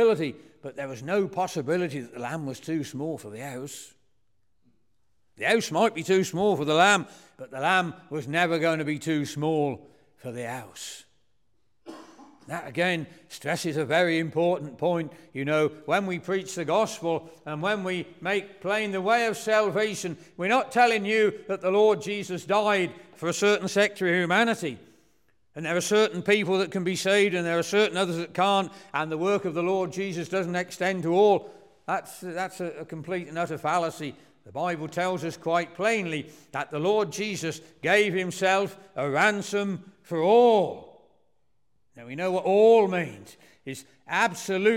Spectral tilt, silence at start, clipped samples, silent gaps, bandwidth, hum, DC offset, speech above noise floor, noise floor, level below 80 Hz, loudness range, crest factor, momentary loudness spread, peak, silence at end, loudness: -4.5 dB/octave; 0 s; under 0.1%; none; 16.5 kHz; none; under 0.1%; 50 dB; -76 dBFS; -74 dBFS; 7 LU; 20 dB; 15 LU; -6 dBFS; 0 s; -26 LUFS